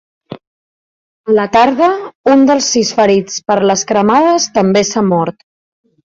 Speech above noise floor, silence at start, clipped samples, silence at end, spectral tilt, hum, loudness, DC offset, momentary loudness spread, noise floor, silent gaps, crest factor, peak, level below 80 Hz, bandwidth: over 79 dB; 0.3 s; under 0.1%; 0.75 s; -4 dB/octave; none; -11 LUFS; under 0.1%; 6 LU; under -90 dBFS; 0.47-1.24 s, 2.15-2.24 s; 12 dB; 0 dBFS; -52 dBFS; 7.8 kHz